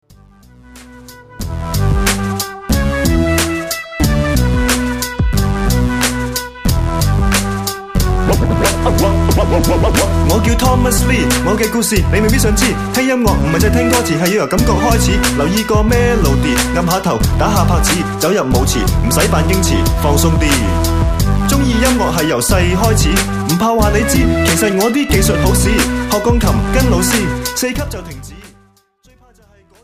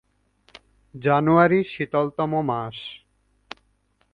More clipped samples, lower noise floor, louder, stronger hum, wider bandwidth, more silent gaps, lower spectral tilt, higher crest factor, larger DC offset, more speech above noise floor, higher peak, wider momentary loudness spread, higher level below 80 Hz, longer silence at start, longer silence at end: neither; second, -50 dBFS vs -66 dBFS; first, -13 LUFS vs -22 LUFS; neither; first, 15.5 kHz vs 6.2 kHz; neither; second, -5 dB/octave vs -9 dB/octave; second, 14 dB vs 20 dB; neither; second, 38 dB vs 45 dB; first, 0 dBFS vs -4 dBFS; second, 5 LU vs 26 LU; first, -20 dBFS vs -60 dBFS; second, 0.75 s vs 0.95 s; first, 1.35 s vs 1.15 s